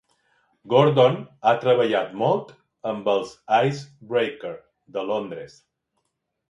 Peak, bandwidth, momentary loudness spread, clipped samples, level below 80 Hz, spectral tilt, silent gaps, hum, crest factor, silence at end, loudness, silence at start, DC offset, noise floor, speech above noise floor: -2 dBFS; 8.2 kHz; 17 LU; under 0.1%; -70 dBFS; -6.5 dB/octave; none; none; 22 dB; 1 s; -22 LUFS; 0.65 s; under 0.1%; -77 dBFS; 55 dB